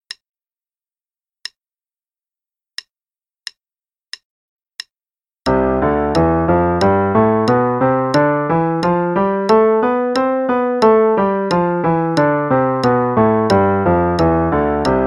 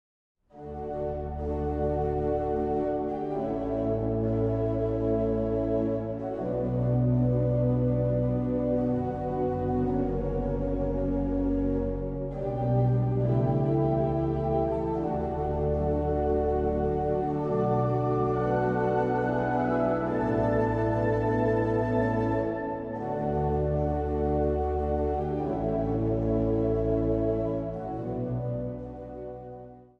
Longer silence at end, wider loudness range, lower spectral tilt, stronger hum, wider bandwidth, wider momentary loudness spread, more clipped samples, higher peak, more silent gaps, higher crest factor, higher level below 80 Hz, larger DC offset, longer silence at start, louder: second, 0 s vs 0.15 s; first, 12 LU vs 3 LU; second, -7.5 dB/octave vs -10.5 dB/octave; neither; first, 11.5 kHz vs 5.6 kHz; first, 20 LU vs 7 LU; neither; first, -2 dBFS vs -14 dBFS; neither; about the same, 16 dB vs 14 dB; about the same, -38 dBFS vs -38 dBFS; neither; first, 5.45 s vs 0.55 s; first, -15 LUFS vs -28 LUFS